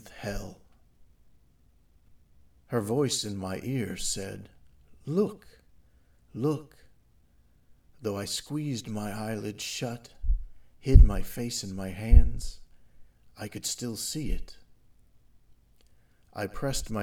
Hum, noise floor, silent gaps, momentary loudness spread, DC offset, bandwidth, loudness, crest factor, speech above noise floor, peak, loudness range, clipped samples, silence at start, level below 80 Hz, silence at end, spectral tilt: none; -64 dBFS; none; 18 LU; under 0.1%; 16 kHz; -30 LUFS; 28 dB; 38 dB; 0 dBFS; 10 LU; under 0.1%; 0.05 s; -30 dBFS; 0 s; -5 dB/octave